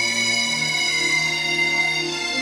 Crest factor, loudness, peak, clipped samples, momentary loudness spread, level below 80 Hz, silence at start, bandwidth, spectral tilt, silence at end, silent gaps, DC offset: 12 dB; -19 LUFS; -8 dBFS; under 0.1%; 2 LU; -60 dBFS; 0 s; 16.5 kHz; -1 dB/octave; 0 s; none; under 0.1%